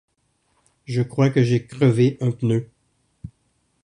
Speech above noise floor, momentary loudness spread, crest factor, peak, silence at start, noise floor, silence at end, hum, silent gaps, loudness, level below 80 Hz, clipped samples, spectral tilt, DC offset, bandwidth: 49 dB; 25 LU; 18 dB; -4 dBFS; 0.9 s; -68 dBFS; 0.55 s; none; none; -20 LUFS; -56 dBFS; under 0.1%; -8 dB/octave; under 0.1%; 10.5 kHz